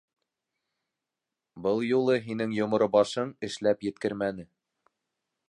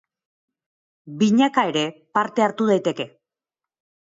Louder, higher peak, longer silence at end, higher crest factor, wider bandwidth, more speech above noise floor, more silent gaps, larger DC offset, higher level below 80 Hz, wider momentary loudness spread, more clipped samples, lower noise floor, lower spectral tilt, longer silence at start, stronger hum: second, -28 LUFS vs -21 LUFS; second, -10 dBFS vs -6 dBFS; about the same, 1.05 s vs 1.05 s; about the same, 20 dB vs 18 dB; first, 11 kHz vs 7.8 kHz; second, 61 dB vs 69 dB; neither; neither; about the same, -68 dBFS vs -72 dBFS; second, 9 LU vs 13 LU; neither; about the same, -88 dBFS vs -89 dBFS; about the same, -6 dB/octave vs -5.5 dB/octave; first, 1.55 s vs 1.05 s; neither